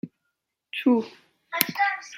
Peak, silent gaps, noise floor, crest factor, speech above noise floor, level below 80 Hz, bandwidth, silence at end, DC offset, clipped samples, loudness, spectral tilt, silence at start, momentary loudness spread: 0 dBFS; none; -80 dBFS; 28 dB; 55 dB; -76 dBFS; 17 kHz; 0 s; under 0.1%; under 0.1%; -25 LUFS; -3.5 dB/octave; 0.05 s; 16 LU